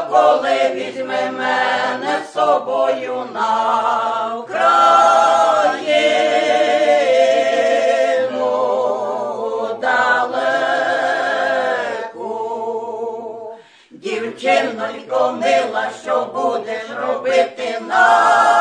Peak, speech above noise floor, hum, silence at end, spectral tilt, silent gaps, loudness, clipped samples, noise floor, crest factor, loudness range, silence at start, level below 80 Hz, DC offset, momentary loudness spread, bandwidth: 0 dBFS; 27 dB; none; 0 s; -2.5 dB/octave; none; -16 LUFS; under 0.1%; -42 dBFS; 16 dB; 7 LU; 0 s; -76 dBFS; under 0.1%; 12 LU; 10.5 kHz